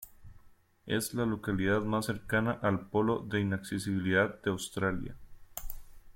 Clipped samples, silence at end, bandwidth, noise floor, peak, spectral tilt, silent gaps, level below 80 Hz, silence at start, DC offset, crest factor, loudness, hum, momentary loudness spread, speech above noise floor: under 0.1%; 0.05 s; 16.5 kHz; -59 dBFS; -14 dBFS; -5.5 dB/octave; none; -52 dBFS; 0 s; under 0.1%; 18 dB; -32 LUFS; none; 16 LU; 28 dB